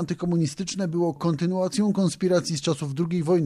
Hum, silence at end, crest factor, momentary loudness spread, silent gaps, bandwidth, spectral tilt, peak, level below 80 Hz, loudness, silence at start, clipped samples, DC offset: none; 0 s; 12 dB; 4 LU; none; 12 kHz; -6 dB/octave; -12 dBFS; -60 dBFS; -25 LUFS; 0 s; under 0.1%; under 0.1%